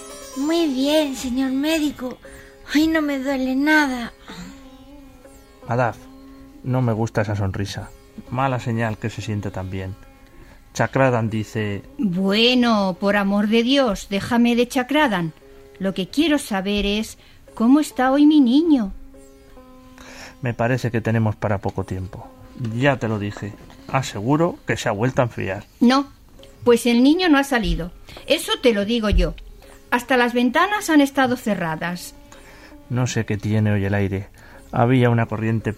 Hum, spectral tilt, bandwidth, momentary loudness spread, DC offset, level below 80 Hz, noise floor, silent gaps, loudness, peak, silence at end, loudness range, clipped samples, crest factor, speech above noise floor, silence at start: none; -5.5 dB/octave; 16 kHz; 16 LU; under 0.1%; -38 dBFS; -46 dBFS; none; -20 LUFS; -4 dBFS; 0 s; 6 LU; under 0.1%; 18 dB; 26 dB; 0 s